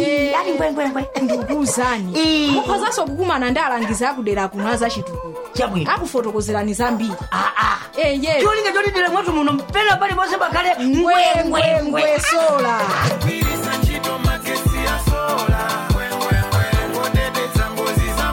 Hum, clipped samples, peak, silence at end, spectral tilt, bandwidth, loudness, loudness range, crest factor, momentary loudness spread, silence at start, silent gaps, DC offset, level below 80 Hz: none; under 0.1%; -4 dBFS; 0 s; -4.5 dB/octave; 17 kHz; -18 LUFS; 4 LU; 14 dB; 5 LU; 0 s; none; under 0.1%; -30 dBFS